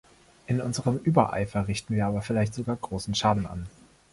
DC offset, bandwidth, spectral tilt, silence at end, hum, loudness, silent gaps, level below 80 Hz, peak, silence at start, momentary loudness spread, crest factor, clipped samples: under 0.1%; 11.5 kHz; -6 dB/octave; 0.45 s; none; -27 LUFS; none; -48 dBFS; -4 dBFS; 0.5 s; 8 LU; 22 dB; under 0.1%